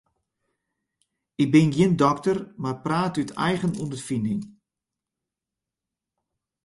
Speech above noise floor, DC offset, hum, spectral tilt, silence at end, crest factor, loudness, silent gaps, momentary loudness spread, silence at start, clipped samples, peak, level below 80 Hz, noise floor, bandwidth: 65 dB; under 0.1%; none; -6.5 dB/octave; 2.2 s; 22 dB; -24 LUFS; none; 13 LU; 1.4 s; under 0.1%; -4 dBFS; -60 dBFS; -88 dBFS; 11.5 kHz